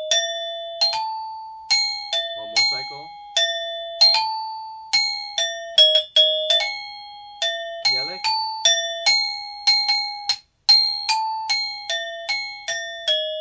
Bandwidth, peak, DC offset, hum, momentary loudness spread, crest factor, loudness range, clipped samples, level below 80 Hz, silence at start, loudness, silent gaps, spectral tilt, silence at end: 8 kHz; -4 dBFS; under 0.1%; none; 15 LU; 20 dB; 4 LU; under 0.1%; -66 dBFS; 0 s; -19 LUFS; none; 2.5 dB/octave; 0 s